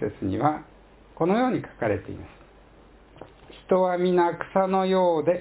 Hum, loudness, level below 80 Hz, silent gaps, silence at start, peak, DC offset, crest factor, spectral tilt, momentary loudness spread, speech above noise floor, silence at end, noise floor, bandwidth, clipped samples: none; -24 LUFS; -54 dBFS; none; 0 s; -8 dBFS; under 0.1%; 18 dB; -11 dB/octave; 8 LU; 28 dB; 0 s; -52 dBFS; 4 kHz; under 0.1%